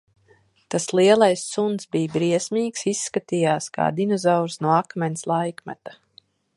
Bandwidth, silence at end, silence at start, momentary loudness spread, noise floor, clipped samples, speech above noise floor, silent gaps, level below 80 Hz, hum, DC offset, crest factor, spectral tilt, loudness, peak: 11.5 kHz; 0.65 s; 0.7 s; 11 LU; -59 dBFS; under 0.1%; 37 dB; none; -68 dBFS; none; under 0.1%; 20 dB; -5 dB/octave; -22 LUFS; -2 dBFS